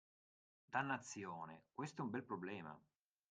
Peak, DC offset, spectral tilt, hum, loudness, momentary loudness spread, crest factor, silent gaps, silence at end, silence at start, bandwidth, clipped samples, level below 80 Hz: -26 dBFS; under 0.1%; -5 dB/octave; none; -47 LUFS; 11 LU; 24 dB; none; 0.5 s; 0.7 s; 9.4 kHz; under 0.1%; -88 dBFS